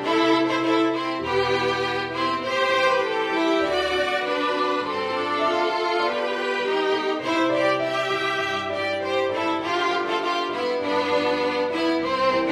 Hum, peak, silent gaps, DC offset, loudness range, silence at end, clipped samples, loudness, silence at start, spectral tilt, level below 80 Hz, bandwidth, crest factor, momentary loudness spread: none; -8 dBFS; none; under 0.1%; 1 LU; 0 s; under 0.1%; -23 LUFS; 0 s; -4 dB/octave; -58 dBFS; 13 kHz; 14 dB; 4 LU